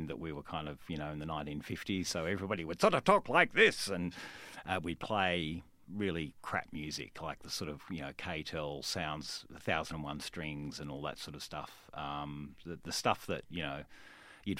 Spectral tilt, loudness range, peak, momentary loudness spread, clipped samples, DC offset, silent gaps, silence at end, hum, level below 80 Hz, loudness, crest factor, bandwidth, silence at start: -4 dB/octave; 9 LU; -10 dBFS; 17 LU; under 0.1%; under 0.1%; none; 0 s; none; -60 dBFS; -36 LUFS; 26 dB; 16 kHz; 0 s